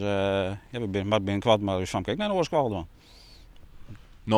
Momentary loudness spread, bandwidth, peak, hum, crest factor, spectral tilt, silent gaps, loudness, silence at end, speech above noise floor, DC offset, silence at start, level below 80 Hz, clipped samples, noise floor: 10 LU; 13.5 kHz; -6 dBFS; none; 20 dB; -6 dB/octave; none; -27 LUFS; 0 s; 22 dB; under 0.1%; 0 s; -52 dBFS; under 0.1%; -49 dBFS